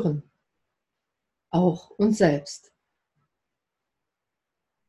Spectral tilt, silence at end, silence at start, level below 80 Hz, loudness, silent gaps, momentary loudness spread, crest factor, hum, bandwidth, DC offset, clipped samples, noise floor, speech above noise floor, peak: -7 dB/octave; 2.3 s; 0 s; -60 dBFS; -24 LUFS; none; 16 LU; 22 dB; none; 11.5 kHz; under 0.1%; under 0.1%; -85 dBFS; 62 dB; -6 dBFS